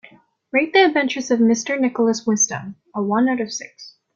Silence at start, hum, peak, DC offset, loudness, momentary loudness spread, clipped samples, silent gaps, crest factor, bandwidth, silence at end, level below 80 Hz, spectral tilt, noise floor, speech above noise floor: 0.55 s; none; -2 dBFS; under 0.1%; -19 LUFS; 14 LU; under 0.1%; none; 18 dB; 7.6 kHz; 0.25 s; -66 dBFS; -3 dB/octave; -50 dBFS; 31 dB